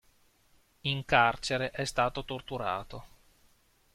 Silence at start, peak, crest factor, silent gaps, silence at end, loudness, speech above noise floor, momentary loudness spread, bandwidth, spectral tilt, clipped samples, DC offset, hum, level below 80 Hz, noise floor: 0.85 s; -8 dBFS; 26 dB; none; 0.85 s; -30 LUFS; 35 dB; 13 LU; 15.5 kHz; -4 dB/octave; under 0.1%; under 0.1%; none; -54 dBFS; -66 dBFS